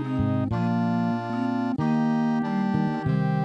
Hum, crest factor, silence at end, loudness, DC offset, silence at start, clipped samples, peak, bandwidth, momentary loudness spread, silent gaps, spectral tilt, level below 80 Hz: none; 12 dB; 0 s; -25 LUFS; under 0.1%; 0 s; under 0.1%; -12 dBFS; 7.4 kHz; 3 LU; none; -9 dB/octave; -50 dBFS